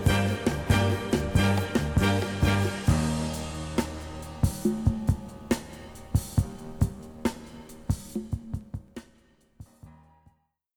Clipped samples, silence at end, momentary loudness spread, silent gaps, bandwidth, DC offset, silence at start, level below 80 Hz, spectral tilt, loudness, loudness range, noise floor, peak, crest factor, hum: under 0.1%; 0.85 s; 15 LU; none; 19 kHz; under 0.1%; 0 s; -38 dBFS; -6 dB/octave; -28 LUFS; 11 LU; -64 dBFS; -8 dBFS; 20 dB; none